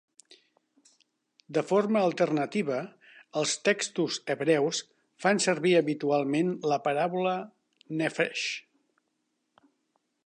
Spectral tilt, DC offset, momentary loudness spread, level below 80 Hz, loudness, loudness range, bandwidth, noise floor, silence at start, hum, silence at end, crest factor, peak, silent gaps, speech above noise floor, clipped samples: -4 dB/octave; under 0.1%; 10 LU; -82 dBFS; -28 LUFS; 4 LU; 11 kHz; -78 dBFS; 1.5 s; none; 1.65 s; 18 dB; -12 dBFS; none; 51 dB; under 0.1%